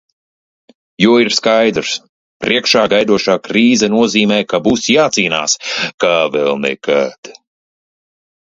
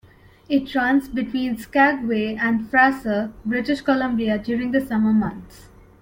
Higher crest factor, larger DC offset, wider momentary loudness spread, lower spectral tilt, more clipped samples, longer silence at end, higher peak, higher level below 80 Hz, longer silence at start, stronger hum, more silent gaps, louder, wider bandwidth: about the same, 14 dB vs 18 dB; neither; about the same, 6 LU vs 8 LU; second, -3.5 dB/octave vs -6.5 dB/octave; neither; first, 1.15 s vs 0.35 s; first, 0 dBFS vs -4 dBFS; about the same, -52 dBFS vs -50 dBFS; first, 1 s vs 0.5 s; neither; first, 2.09-2.40 s, 5.94-5.98 s, 7.18-7.23 s vs none; first, -13 LUFS vs -21 LUFS; second, 7.8 kHz vs 16.5 kHz